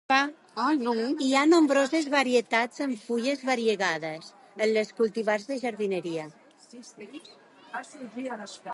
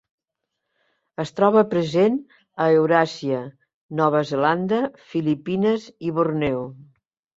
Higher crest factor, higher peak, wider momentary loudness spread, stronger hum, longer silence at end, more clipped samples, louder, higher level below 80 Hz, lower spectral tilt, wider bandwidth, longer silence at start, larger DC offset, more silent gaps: about the same, 20 dB vs 20 dB; second, -8 dBFS vs -2 dBFS; first, 19 LU vs 13 LU; neither; second, 0 s vs 0.55 s; neither; second, -26 LUFS vs -21 LUFS; second, -80 dBFS vs -60 dBFS; second, -3.5 dB/octave vs -7 dB/octave; first, 11.5 kHz vs 7.8 kHz; second, 0.1 s vs 1.2 s; neither; second, none vs 3.74-3.89 s